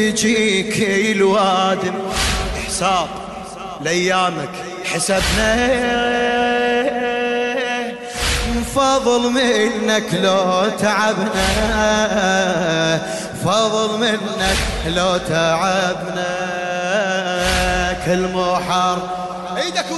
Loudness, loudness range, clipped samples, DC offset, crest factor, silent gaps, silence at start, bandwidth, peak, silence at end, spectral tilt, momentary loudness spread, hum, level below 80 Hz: -17 LUFS; 2 LU; under 0.1%; under 0.1%; 12 dB; none; 0 s; 12.5 kHz; -4 dBFS; 0 s; -3.5 dB/octave; 7 LU; none; -32 dBFS